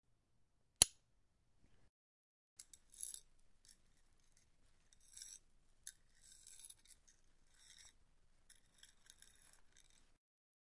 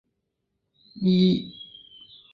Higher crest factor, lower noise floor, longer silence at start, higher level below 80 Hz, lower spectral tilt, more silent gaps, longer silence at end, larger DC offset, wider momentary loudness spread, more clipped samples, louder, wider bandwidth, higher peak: first, 44 dB vs 18 dB; about the same, -79 dBFS vs -79 dBFS; second, 0.8 s vs 0.95 s; second, -70 dBFS vs -60 dBFS; second, 0.5 dB/octave vs -9 dB/octave; first, 1.89-2.56 s vs none; first, 4 s vs 0.7 s; neither; first, 31 LU vs 23 LU; neither; second, -38 LUFS vs -23 LUFS; first, 12 kHz vs 5.2 kHz; first, -6 dBFS vs -10 dBFS